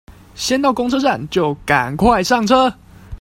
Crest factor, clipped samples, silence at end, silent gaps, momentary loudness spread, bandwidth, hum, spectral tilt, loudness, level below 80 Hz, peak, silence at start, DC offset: 16 dB; under 0.1%; 0.05 s; none; 6 LU; 16.5 kHz; none; -4.5 dB/octave; -16 LUFS; -38 dBFS; 0 dBFS; 0.1 s; under 0.1%